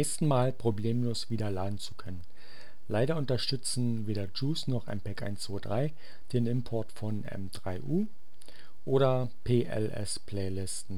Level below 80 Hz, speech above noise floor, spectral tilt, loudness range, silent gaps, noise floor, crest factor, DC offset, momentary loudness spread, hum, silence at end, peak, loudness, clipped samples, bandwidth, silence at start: -58 dBFS; 24 dB; -6 dB/octave; 3 LU; none; -56 dBFS; 18 dB; 3%; 11 LU; none; 0 s; -14 dBFS; -33 LUFS; under 0.1%; 15.5 kHz; 0 s